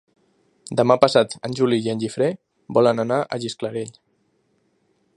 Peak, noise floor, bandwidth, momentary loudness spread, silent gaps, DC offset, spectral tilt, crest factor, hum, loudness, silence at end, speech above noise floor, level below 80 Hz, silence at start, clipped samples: 0 dBFS; -66 dBFS; 11.5 kHz; 12 LU; none; under 0.1%; -5.5 dB/octave; 22 dB; none; -21 LUFS; 1.25 s; 46 dB; -66 dBFS; 0.7 s; under 0.1%